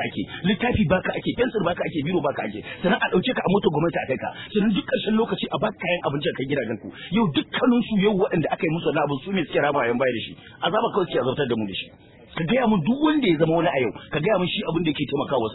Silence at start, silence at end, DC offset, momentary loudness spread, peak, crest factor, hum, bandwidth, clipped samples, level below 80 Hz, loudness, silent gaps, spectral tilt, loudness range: 0 s; 0 s; under 0.1%; 7 LU; -6 dBFS; 16 dB; none; 4.1 kHz; under 0.1%; -50 dBFS; -23 LUFS; none; -10.5 dB/octave; 2 LU